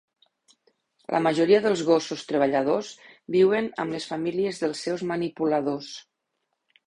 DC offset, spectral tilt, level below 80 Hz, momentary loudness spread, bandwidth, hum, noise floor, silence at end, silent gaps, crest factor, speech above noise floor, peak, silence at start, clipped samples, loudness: under 0.1%; -5.5 dB/octave; -68 dBFS; 13 LU; 11 kHz; none; -79 dBFS; 0.85 s; none; 18 dB; 55 dB; -6 dBFS; 1.1 s; under 0.1%; -25 LUFS